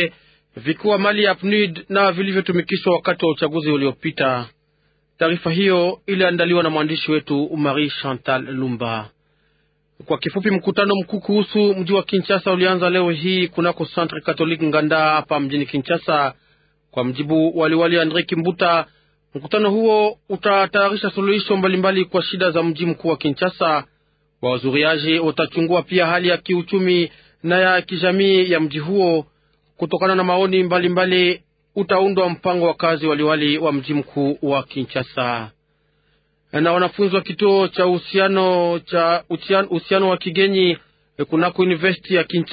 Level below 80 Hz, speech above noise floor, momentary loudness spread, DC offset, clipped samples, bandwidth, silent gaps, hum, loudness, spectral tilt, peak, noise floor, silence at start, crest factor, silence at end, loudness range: -62 dBFS; 46 dB; 7 LU; under 0.1%; under 0.1%; 5 kHz; none; none; -18 LUFS; -11 dB/octave; -4 dBFS; -64 dBFS; 0 s; 16 dB; 0 s; 3 LU